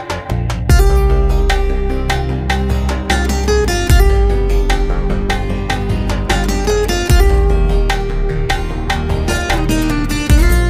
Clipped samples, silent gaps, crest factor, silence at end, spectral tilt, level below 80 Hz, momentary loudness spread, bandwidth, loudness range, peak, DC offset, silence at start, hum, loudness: under 0.1%; none; 12 dB; 0 s; -5.5 dB/octave; -14 dBFS; 6 LU; 15.5 kHz; 1 LU; 0 dBFS; under 0.1%; 0 s; none; -15 LUFS